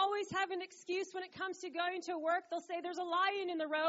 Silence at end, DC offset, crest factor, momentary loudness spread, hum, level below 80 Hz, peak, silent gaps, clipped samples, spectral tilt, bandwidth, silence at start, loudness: 0 s; under 0.1%; 16 dB; 8 LU; none; -86 dBFS; -22 dBFS; none; under 0.1%; -0.5 dB/octave; 7.6 kHz; 0 s; -38 LUFS